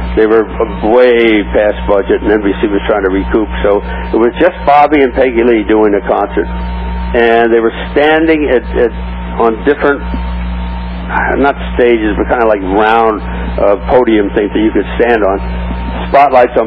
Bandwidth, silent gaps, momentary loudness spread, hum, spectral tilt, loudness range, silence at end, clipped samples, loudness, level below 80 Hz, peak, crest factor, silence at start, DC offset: 5.4 kHz; none; 11 LU; 60 Hz at -25 dBFS; -9.5 dB/octave; 3 LU; 0 s; 0.6%; -11 LUFS; -22 dBFS; 0 dBFS; 10 dB; 0 s; under 0.1%